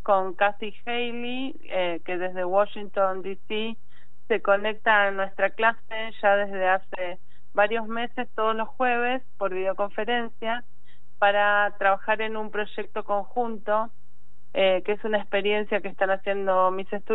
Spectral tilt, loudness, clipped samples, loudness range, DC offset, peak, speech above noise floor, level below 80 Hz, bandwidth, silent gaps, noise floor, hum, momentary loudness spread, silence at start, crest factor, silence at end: -7 dB/octave; -26 LUFS; under 0.1%; 3 LU; 4%; -8 dBFS; 38 dB; -68 dBFS; 4.1 kHz; none; -64 dBFS; none; 10 LU; 0.1 s; 18 dB; 0 s